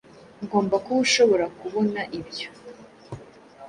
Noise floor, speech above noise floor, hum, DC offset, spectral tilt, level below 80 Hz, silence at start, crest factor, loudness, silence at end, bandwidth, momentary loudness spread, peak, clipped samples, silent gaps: -46 dBFS; 23 dB; none; under 0.1%; -3.5 dB/octave; -62 dBFS; 0.4 s; 18 dB; -23 LUFS; 0 s; 11 kHz; 24 LU; -6 dBFS; under 0.1%; none